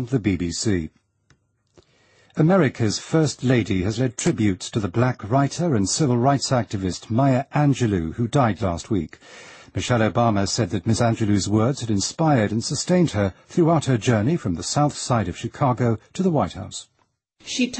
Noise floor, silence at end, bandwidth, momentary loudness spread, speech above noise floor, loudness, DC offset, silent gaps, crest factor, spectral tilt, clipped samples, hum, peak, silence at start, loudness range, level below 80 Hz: -63 dBFS; 0 s; 8.8 kHz; 8 LU; 42 dB; -22 LUFS; under 0.1%; none; 18 dB; -5.5 dB/octave; under 0.1%; none; -4 dBFS; 0 s; 2 LU; -48 dBFS